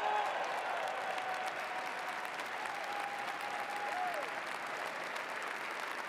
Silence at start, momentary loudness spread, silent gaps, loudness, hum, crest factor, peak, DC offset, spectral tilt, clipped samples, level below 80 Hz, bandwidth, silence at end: 0 s; 3 LU; none; -38 LUFS; none; 18 dB; -22 dBFS; under 0.1%; -1.5 dB/octave; under 0.1%; -90 dBFS; 16 kHz; 0 s